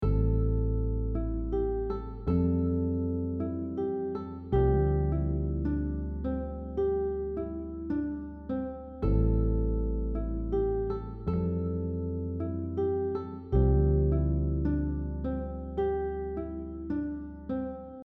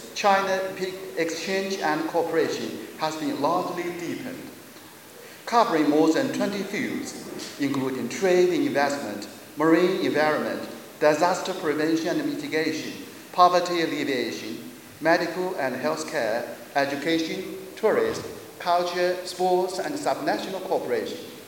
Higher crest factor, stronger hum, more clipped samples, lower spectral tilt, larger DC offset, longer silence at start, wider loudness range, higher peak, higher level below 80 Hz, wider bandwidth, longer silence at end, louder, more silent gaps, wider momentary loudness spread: second, 16 dB vs 22 dB; neither; neither; first, -12.5 dB/octave vs -4.5 dB/octave; neither; about the same, 0 s vs 0 s; about the same, 4 LU vs 3 LU; second, -14 dBFS vs -4 dBFS; first, -34 dBFS vs -70 dBFS; second, 4.2 kHz vs 17 kHz; about the same, 0.05 s vs 0 s; second, -31 LUFS vs -25 LUFS; neither; second, 9 LU vs 14 LU